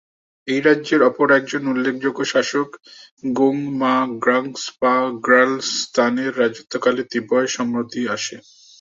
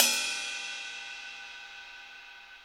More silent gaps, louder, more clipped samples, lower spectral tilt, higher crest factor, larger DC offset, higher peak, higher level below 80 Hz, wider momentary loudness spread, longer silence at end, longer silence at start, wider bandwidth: first, 3.11-3.17 s vs none; first, -19 LUFS vs -33 LUFS; neither; first, -4 dB/octave vs 3 dB/octave; second, 18 dB vs 28 dB; neither; first, -2 dBFS vs -6 dBFS; first, -66 dBFS vs -72 dBFS; second, 9 LU vs 17 LU; first, 0.4 s vs 0 s; first, 0.45 s vs 0 s; second, 7.8 kHz vs over 20 kHz